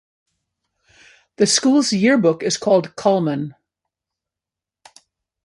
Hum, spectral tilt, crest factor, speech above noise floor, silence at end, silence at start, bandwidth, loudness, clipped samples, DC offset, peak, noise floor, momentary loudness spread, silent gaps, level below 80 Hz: none; -4 dB/octave; 18 dB; 71 dB; 1.95 s; 1.4 s; 11.5 kHz; -17 LUFS; under 0.1%; under 0.1%; -2 dBFS; -87 dBFS; 8 LU; none; -66 dBFS